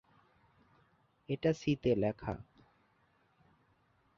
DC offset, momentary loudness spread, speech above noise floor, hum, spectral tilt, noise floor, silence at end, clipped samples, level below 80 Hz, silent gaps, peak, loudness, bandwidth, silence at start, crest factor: under 0.1%; 11 LU; 39 dB; none; -6.5 dB/octave; -72 dBFS; 1.75 s; under 0.1%; -62 dBFS; none; -18 dBFS; -35 LUFS; 7 kHz; 1.3 s; 20 dB